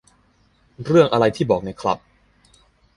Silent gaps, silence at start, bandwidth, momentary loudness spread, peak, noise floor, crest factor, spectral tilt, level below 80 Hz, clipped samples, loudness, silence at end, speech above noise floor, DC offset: none; 0.8 s; 11.5 kHz; 12 LU; -2 dBFS; -59 dBFS; 20 dB; -7 dB/octave; -52 dBFS; under 0.1%; -19 LUFS; 1 s; 41 dB; under 0.1%